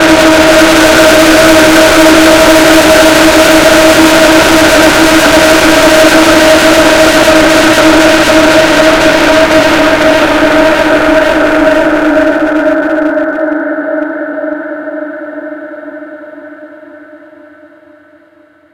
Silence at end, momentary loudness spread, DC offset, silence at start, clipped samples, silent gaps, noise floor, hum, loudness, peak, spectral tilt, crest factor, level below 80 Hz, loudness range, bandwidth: 1.55 s; 13 LU; under 0.1%; 0 s; 10%; none; -43 dBFS; none; -5 LUFS; 0 dBFS; -3 dB/octave; 6 dB; -28 dBFS; 15 LU; over 20 kHz